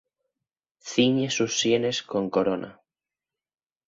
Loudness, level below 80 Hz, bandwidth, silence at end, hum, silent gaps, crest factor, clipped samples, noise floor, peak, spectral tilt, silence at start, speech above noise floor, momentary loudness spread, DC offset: -25 LUFS; -66 dBFS; 7.8 kHz; 1.15 s; none; none; 18 dB; under 0.1%; under -90 dBFS; -8 dBFS; -4 dB/octave; 0.85 s; over 66 dB; 10 LU; under 0.1%